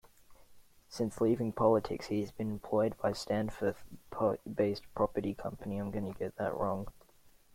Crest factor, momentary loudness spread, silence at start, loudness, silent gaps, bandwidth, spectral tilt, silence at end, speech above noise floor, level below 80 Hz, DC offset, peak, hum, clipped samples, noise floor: 20 dB; 10 LU; 0.3 s; -34 LUFS; none; 16.5 kHz; -7 dB/octave; 0.25 s; 28 dB; -58 dBFS; under 0.1%; -14 dBFS; none; under 0.1%; -62 dBFS